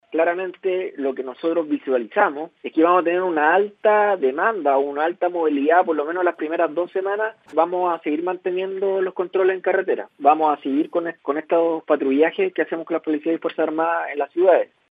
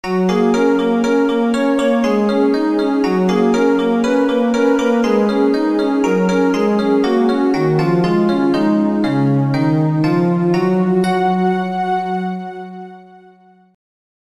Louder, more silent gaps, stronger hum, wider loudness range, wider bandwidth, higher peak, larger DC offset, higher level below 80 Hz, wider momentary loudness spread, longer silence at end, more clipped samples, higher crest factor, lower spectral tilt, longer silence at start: second, -21 LUFS vs -15 LUFS; neither; neither; about the same, 3 LU vs 3 LU; second, 4.8 kHz vs 13 kHz; about the same, -2 dBFS vs -2 dBFS; second, under 0.1% vs 0.4%; second, -86 dBFS vs -50 dBFS; first, 8 LU vs 3 LU; second, 0.25 s vs 1.2 s; neither; first, 18 dB vs 12 dB; about the same, -8 dB/octave vs -7.5 dB/octave; about the same, 0.1 s vs 0.05 s